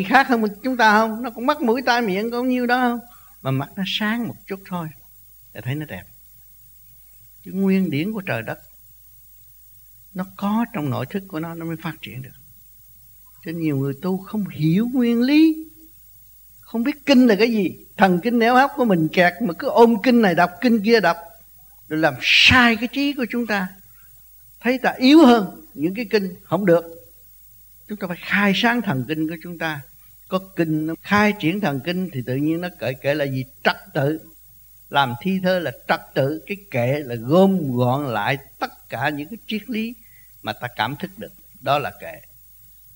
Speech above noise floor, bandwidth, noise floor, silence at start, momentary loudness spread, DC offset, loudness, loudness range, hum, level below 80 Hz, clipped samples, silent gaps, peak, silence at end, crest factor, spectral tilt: 28 dB; 16.5 kHz; -47 dBFS; 0 s; 16 LU; under 0.1%; -20 LUFS; 11 LU; none; -54 dBFS; under 0.1%; none; -2 dBFS; 0.75 s; 20 dB; -6 dB/octave